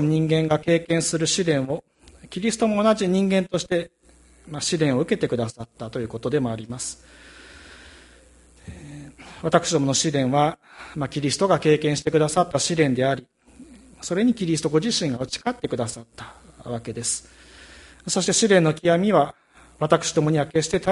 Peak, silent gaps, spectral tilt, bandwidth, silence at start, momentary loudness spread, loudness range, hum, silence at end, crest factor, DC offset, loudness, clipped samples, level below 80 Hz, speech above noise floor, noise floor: -2 dBFS; none; -4.5 dB/octave; 11.5 kHz; 0 s; 17 LU; 8 LU; none; 0 s; 22 dB; under 0.1%; -22 LUFS; under 0.1%; -54 dBFS; 32 dB; -54 dBFS